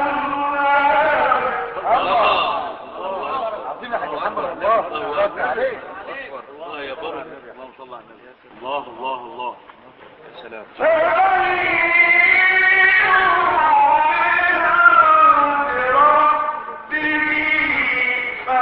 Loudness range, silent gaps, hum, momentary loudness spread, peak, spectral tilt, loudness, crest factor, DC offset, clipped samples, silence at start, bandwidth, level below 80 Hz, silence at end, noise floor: 18 LU; none; none; 19 LU; 0 dBFS; -8 dB/octave; -15 LUFS; 18 dB; under 0.1%; under 0.1%; 0 s; 5.6 kHz; -52 dBFS; 0 s; -45 dBFS